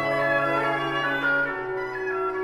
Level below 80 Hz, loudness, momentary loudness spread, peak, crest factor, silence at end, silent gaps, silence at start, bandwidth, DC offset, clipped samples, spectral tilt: -56 dBFS; -24 LUFS; 7 LU; -12 dBFS; 14 dB; 0 s; none; 0 s; 15 kHz; under 0.1%; under 0.1%; -5.5 dB/octave